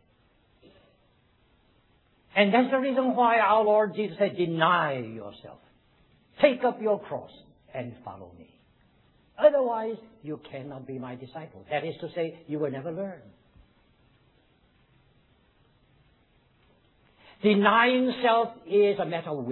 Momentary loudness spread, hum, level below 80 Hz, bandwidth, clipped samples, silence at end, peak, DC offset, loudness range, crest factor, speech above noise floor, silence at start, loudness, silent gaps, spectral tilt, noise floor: 19 LU; none; -70 dBFS; 4.2 kHz; under 0.1%; 0 s; -6 dBFS; under 0.1%; 11 LU; 22 dB; 39 dB; 2.35 s; -25 LUFS; none; -9 dB/octave; -65 dBFS